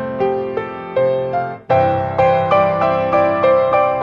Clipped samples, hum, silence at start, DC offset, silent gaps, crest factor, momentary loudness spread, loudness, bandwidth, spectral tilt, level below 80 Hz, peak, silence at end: under 0.1%; none; 0 s; under 0.1%; none; 14 dB; 8 LU; -16 LUFS; 6.4 kHz; -8 dB/octave; -48 dBFS; -2 dBFS; 0 s